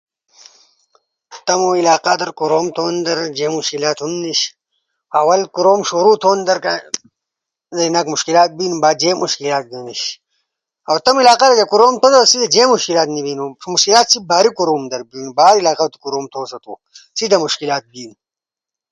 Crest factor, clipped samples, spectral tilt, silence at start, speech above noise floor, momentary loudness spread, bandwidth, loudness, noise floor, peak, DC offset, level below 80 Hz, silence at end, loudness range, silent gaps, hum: 16 dB; under 0.1%; -2.5 dB/octave; 1.3 s; 73 dB; 14 LU; 11.5 kHz; -14 LUFS; -88 dBFS; 0 dBFS; under 0.1%; -64 dBFS; 0.8 s; 6 LU; none; none